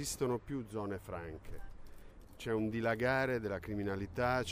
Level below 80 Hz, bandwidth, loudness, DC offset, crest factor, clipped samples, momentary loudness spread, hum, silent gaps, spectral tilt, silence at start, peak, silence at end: -54 dBFS; 15.5 kHz; -37 LUFS; under 0.1%; 18 dB; under 0.1%; 16 LU; none; none; -5 dB/octave; 0 s; -18 dBFS; 0 s